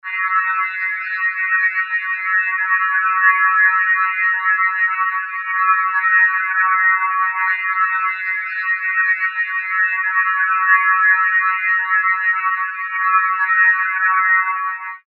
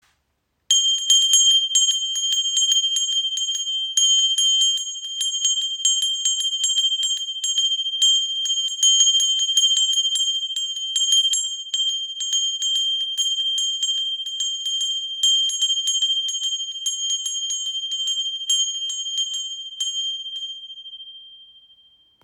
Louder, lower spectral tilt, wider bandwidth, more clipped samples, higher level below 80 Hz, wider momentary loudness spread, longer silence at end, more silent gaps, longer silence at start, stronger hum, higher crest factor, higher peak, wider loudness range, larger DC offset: first, -15 LUFS vs -18 LUFS; first, 4.5 dB/octave vs 7.5 dB/octave; second, 4.6 kHz vs 16.5 kHz; neither; second, under -90 dBFS vs -80 dBFS; about the same, 7 LU vs 9 LU; second, 0.1 s vs 0.8 s; neither; second, 0.05 s vs 0.7 s; neither; about the same, 16 dB vs 18 dB; about the same, -2 dBFS vs -4 dBFS; second, 2 LU vs 6 LU; neither